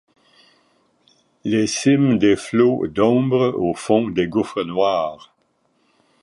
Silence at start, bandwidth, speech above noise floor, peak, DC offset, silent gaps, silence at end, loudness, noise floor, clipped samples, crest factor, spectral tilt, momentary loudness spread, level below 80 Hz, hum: 1.45 s; 11.5 kHz; 47 dB; -2 dBFS; under 0.1%; none; 1.05 s; -19 LUFS; -65 dBFS; under 0.1%; 18 dB; -6 dB/octave; 7 LU; -54 dBFS; none